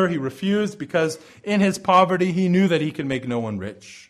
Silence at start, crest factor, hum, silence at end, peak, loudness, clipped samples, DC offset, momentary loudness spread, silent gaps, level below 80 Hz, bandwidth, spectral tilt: 0 s; 16 dB; none; 0.1 s; -4 dBFS; -21 LUFS; under 0.1%; under 0.1%; 11 LU; none; -60 dBFS; 12.5 kHz; -6 dB/octave